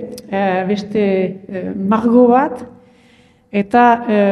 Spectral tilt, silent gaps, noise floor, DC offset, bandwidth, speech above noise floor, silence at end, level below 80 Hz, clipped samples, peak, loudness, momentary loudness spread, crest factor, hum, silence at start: -7.5 dB/octave; none; -50 dBFS; under 0.1%; 11 kHz; 36 dB; 0 s; -56 dBFS; under 0.1%; 0 dBFS; -15 LUFS; 12 LU; 16 dB; none; 0 s